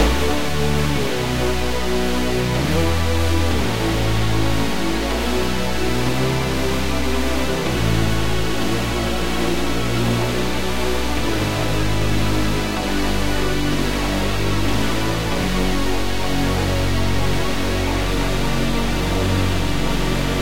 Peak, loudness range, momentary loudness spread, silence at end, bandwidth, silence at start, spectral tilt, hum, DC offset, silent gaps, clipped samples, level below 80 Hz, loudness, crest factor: -4 dBFS; 1 LU; 2 LU; 0 s; 16 kHz; 0 s; -5 dB/octave; none; 6%; none; under 0.1%; -26 dBFS; -21 LUFS; 14 dB